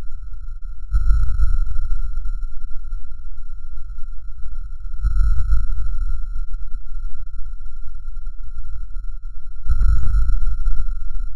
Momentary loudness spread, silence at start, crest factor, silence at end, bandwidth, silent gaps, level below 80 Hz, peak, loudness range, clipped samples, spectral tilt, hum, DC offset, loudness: 16 LU; 0 s; 14 dB; 0 s; 1.6 kHz; none; -20 dBFS; 0 dBFS; 8 LU; under 0.1%; -7 dB/octave; none; under 0.1%; -28 LUFS